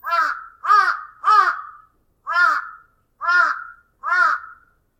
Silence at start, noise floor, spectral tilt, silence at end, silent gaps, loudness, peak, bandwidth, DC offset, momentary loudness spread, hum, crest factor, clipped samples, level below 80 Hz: 0.05 s; -54 dBFS; 0 dB/octave; 0.45 s; none; -18 LUFS; -2 dBFS; 15.5 kHz; under 0.1%; 14 LU; none; 18 dB; under 0.1%; -66 dBFS